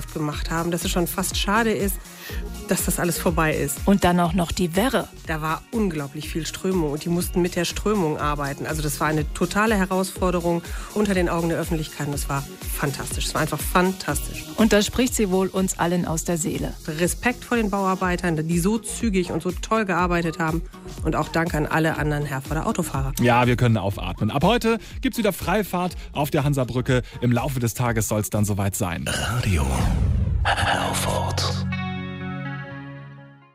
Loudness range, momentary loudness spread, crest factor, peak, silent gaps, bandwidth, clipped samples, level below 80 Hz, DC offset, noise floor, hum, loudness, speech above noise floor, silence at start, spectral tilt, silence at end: 3 LU; 8 LU; 16 dB; -6 dBFS; none; 16 kHz; under 0.1%; -34 dBFS; under 0.1%; -44 dBFS; none; -23 LUFS; 21 dB; 0 s; -5 dB/octave; 0.2 s